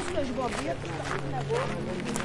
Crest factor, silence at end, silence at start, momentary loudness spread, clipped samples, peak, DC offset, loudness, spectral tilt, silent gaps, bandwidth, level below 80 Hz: 18 dB; 0 s; 0 s; 3 LU; under 0.1%; -12 dBFS; under 0.1%; -32 LUFS; -5 dB/octave; none; 11.5 kHz; -46 dBFS